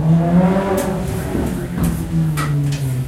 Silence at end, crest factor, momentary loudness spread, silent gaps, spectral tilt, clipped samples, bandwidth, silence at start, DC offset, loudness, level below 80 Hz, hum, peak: 0 s; 14 dB; 7 LU; none; -7.5 dB/octave; under 0.1%; 16 kHz; 0 s; under 0.1%; -18 LUFS; -32 dBFS; none; -4 dBFS